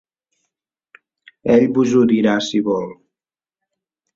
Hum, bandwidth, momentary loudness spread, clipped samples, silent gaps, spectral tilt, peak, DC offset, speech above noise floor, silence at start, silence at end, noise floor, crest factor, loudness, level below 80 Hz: none; 7.6 kHz; 10 LU; under 0.1%; none; -6 dB/octave; -2 dBFS; under 0.1%; over 75 dB; 1.45 s; 1.25 s; under -90 dBFS; 18 dB; -16 LUFS; -58 dBFS